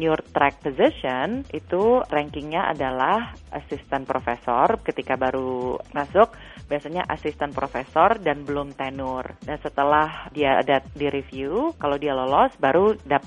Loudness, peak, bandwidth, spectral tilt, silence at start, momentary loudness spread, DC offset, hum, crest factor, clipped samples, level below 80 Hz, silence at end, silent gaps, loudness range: -23 LUFS; -2 dBFS; 10 kHz; -7 dB/octave; 0 s; 10 LU; under 0.1%; none; 20 dB; under 0.1%; -48 dBFS; 0 s; none; 3 LU